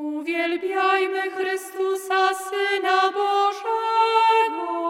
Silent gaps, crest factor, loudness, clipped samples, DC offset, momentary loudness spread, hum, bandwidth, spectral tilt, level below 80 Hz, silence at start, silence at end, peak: none; 14 dB; -22 LUFS; under 0.1%; under 0.1%; 8 LU; none; 16.5 kHz; -0.5 dB/octave; -86 dBFS; 0 s; 0 s; -8 dBFS